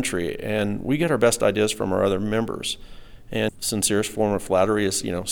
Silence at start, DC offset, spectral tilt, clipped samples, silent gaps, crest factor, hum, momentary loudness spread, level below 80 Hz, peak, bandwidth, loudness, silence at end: 0 s; under 0.1%; -4 dB/octave; under 0.1%; none; 16 dB; none; 8 LU; -46 dBFS; -8 dBFS; 19.5 kHz; -23 LUFS; 0 s